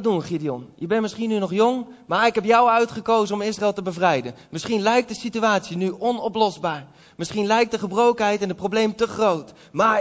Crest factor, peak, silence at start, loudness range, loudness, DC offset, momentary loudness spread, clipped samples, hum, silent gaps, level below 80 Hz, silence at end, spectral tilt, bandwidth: 16 dB; -4 dBFS; 0 s; 2 LU; -21 LUFS; under 0.1%; 10 LU; under 0.1%; none; none; -60 dBFS; 0 s; -5 dB/octave; 8 kHz